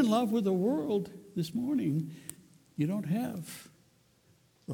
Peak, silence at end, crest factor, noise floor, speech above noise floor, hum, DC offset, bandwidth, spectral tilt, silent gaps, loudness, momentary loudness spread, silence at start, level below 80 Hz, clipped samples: -16 dBFS; 0 s; 16 dB; -66 dBFS; 35 dB; none; under 0.1%; 19 kHz; -7 dB/octave; none; -32 LUFS; 18 LU; 0 s; -72 dBFS; under 0.1%